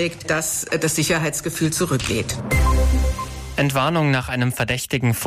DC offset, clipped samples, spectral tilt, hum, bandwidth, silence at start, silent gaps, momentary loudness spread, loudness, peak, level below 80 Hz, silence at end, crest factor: under 0.1%; under 0.1%; -4.5 dB/octave; none; 15.5 kHz; 0 s; none; 4 LU; -21 LUFS; -8 dBFS; -26 dBFS; 0 s; 12 dB